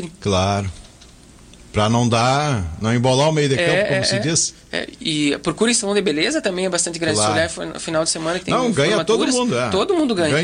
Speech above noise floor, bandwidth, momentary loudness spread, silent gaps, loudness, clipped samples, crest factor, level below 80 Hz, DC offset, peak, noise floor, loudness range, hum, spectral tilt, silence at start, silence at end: 26 dB; 10.5 kHz; 6 LU; none; -18 LUFS; under 0.1%; 14 dB; -46 dBFS; under 0.1%; -6 dBFS; -45 dBFS; 2 LU; none; -4 dB/octave; 0 s; 0 s